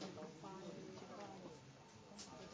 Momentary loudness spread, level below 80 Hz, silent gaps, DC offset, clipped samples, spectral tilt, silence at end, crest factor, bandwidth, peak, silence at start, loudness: 7 LU; -78 dBFS; none; under 0.1%; under 0.1%; -4.5 dB/octave; 0 s; 16 dB; 8 kHz; -38 dBFS; 0 s; -55 LUFS